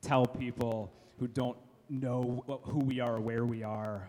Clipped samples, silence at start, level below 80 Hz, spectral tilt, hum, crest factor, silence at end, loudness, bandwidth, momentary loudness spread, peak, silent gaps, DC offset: under 0.1%; 0.05 s; -64 dBFS; -7.5 dB/octave; none; 20 dB; 0 s; -35 LUFS; 14 kHz; 8 LU; -14 dBFS; none; under 0.1%